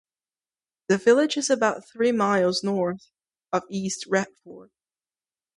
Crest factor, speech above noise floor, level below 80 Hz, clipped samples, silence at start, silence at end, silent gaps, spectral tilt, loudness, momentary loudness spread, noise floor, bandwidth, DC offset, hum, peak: 20 dB; over 67 dB; -70 dBFS; under 0.1%; 0.9 s; 0.95 s; none; -4 dB/octave; -24 LUFS; 10 LU; under -90 dBFS; 11.5 kHz; under 0.1%; none; -6 dBFS